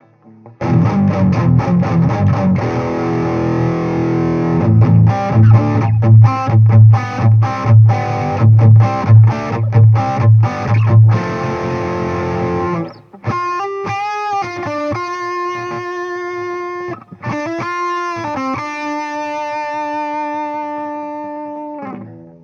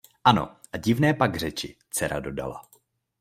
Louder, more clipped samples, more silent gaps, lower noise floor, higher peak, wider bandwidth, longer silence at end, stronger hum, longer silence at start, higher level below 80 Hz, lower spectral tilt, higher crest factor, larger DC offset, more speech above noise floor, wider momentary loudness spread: first, -14 LUFS vs -25 LUFS; neither; neither; second, -42 dBFS vs -63 dBFS; first, 0 dBFS vs -4 dBFS; second, 6.6 kHz vs 16 kHz; second, 0.15 s vs 0.6 s; neither; first, 0.45 s vs 0.25 s; first, -42 dBFS vs -52 dBFS; first, -9 dB/octave vs -5 dB/octave; second, 14 dB vs 22 dB; neither; second, 31 dB vs 38 dB; about the same, 14 LU vs 14 LU